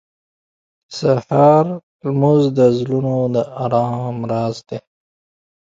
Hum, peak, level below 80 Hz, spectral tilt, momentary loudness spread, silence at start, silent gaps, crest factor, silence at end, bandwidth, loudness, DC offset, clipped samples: none; 0 dBFS; -58 dBFS; -8 dB/octave; 14 LU; 0.9 s; 1.83-1.99 s; 18 dB; 0.9 s; 7.6 kHz; -17 LUFS; under 0.1%; under 0.1%